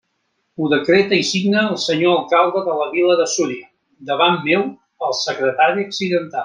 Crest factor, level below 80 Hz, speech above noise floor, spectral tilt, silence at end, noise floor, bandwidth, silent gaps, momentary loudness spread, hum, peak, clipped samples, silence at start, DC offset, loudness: 16 dB; -64 dBFS; 52 dB; -4 dB/octave; 0 s; -69 dBFS; 10 kHz; none; 10 LU; none; -2 dBFS; under 0.1%; 0.6 s; under 0.1%; -17 LUFS